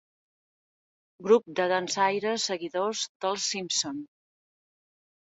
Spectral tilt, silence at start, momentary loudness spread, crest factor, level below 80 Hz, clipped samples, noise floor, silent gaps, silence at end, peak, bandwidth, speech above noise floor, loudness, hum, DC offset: -2.5 dB/octave; 1.2 s; 7 LU; 20 dB; -78 dBFS; under 0.1%; under -90 dBFS; 3.09-3.20 s; 1.15 s; -10 dBFS; 8.4 kHz; over 63 dB; -27 LUFS; none; under 0.1%